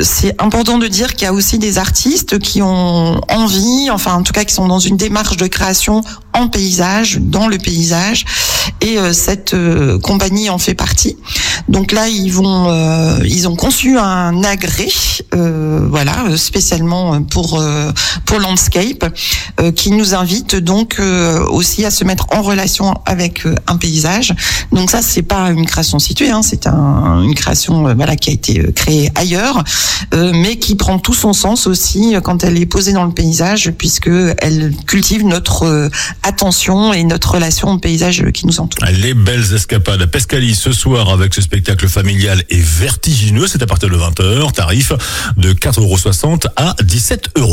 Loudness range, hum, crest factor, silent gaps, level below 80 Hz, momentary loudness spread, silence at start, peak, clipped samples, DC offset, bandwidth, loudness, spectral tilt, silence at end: 1 LU; none; 12 dB; none; -24 dBFS; 3 LU; 0 s; 0 dBFS; under 0.1%; under 0.1%; 16.5 kHz; -11 LUFS; -4 dB/octave; 0 s